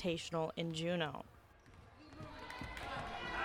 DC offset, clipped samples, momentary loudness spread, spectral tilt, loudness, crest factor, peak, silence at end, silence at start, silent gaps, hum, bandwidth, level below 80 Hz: under 0.1%; under 0.1%; 21 LU; -5 dB/octave; -42 LUFS; 18 dB; -24 dBFS; 0 s; 0 s; none; none; 16 kHz; -60 dBFS